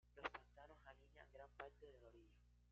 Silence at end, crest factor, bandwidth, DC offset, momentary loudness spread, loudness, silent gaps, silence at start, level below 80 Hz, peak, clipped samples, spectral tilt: 0 s; 28 dB; 7 kHz; under 0.1%; 14 LU; -60 LUFS; none; 0.05 s; -72 dBFS; -32 dBFS; under 0.1%; -2 dB/octave